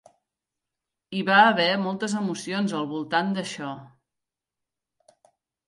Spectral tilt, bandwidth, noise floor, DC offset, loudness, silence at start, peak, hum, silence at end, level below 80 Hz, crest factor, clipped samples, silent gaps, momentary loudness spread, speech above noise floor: -4.5 dB/octave; 11.5 kHz; -87 dBFS; under 0.1%; -24 LUFS; 1.1 s; -4 dBFS; none; 1.8 s; -76 dBFS; 24 dB; under 0.1%; none; 16 LU; 64 dB